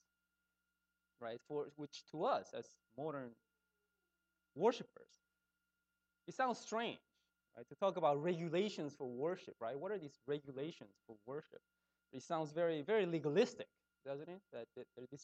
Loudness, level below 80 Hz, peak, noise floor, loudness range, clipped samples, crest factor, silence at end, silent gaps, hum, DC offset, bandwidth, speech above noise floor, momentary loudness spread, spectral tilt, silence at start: -42 LUFS; under -90 dBFS; -22 dBFS; -89 dBFS; 6 LU; under 0.1%; 22 dB; 0 s; none; none; under 0.1%; 8.6 kHz; 47 dB; 20 LU; -5.5 dB/octave; 1.2 s